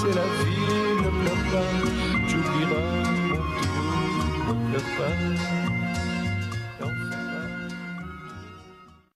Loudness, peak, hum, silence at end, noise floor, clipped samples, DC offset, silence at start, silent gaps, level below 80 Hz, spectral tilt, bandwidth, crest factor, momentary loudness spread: -26 LUFS; -12 dBFS; none; 0.25 s; -50 dBFS; under 0.1%; under 0.1%; 0 s; none; -40 dBFS; -6 dB/octave; 14 kHz; 14 dB; 11 LU